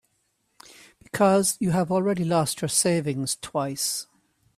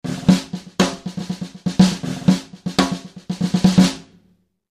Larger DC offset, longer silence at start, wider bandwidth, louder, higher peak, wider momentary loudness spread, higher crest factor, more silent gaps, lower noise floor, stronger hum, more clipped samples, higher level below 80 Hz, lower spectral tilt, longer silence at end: neither; first, 1.15 s vs 0.05 s; first, 16 kHz vs 13 kHz; second, -24 LUFS vs -19 LUFS; second, -8 dBFS vs 0 dBFS; second, 8 LU vs 14 LU; about the same, 18 dB vs 18 dB; neither; first, -72 dBFS vs -60 dBFS; neither; neither; second, -62 dBFS vs -46 dBFS; about the same, -4.5 dB/octave vs -5.5 dB/octave; second, 0.55 s vs 0.75 s